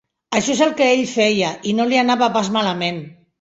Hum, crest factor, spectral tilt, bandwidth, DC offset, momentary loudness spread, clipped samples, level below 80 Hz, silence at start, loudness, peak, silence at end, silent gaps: none; 16 dB; -4 dB/octave; 8 kHz; under 0.1%; 7 LU; under 0.1%; -60 dBFS; 0.3 s; -17 LUFS; -2 dBFS; 0.3 s; none